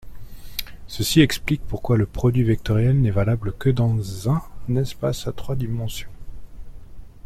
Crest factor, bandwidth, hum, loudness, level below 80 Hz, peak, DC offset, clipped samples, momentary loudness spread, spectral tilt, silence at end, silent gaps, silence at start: 20 dB; 15.5 kHz; none; -22 LUFS; -36 dBFS; -2 dBFS; under 0.1%; under 0.1%; 14 LU; -6.5 dB/octave; 0.05 s; none; 0.05 s